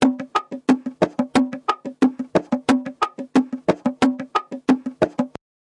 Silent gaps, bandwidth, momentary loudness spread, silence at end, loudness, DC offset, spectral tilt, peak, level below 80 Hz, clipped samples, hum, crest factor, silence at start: none; 11 kHz; 6 LU; 0.5 s; -22 LUFS; under 0.1%; -5.5 dB/octave; -4 dBFS; -58 dBFS; under 0.1%; none; 18 dB; 0 s